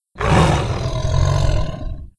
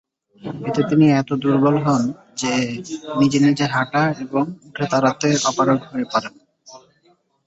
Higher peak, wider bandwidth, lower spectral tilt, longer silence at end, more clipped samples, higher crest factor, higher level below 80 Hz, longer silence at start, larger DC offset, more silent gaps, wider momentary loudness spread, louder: first, 0 dBFS vs -4 dBFS; first, 11 kHz vs 8.2 kHz; about the same, -6 dB/octave vs -5.5 dB/octave; second, 0.1 s vs 0.7 s; neither; about the same, 16 dB vs 16 dB; first, -24 dBFS vs -60 dBFS; second, 0.15 s vs 0.45 s; neither; neither; about the same, 10 LU vs 11 LU; about the same, -18 LUFS vs -19 LUFS